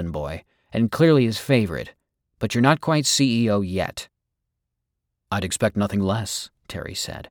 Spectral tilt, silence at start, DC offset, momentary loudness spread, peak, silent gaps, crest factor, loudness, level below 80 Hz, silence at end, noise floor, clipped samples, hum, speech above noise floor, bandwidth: -5 dB/octave; 0 s; under 0.1%; 15 LU; -4 dBFS; none; 20 dB; -22 LUFS; -48 dBFS; 0.05 s; -80 dBFS; under 0.1%; none; 58 dB; over 20 kHz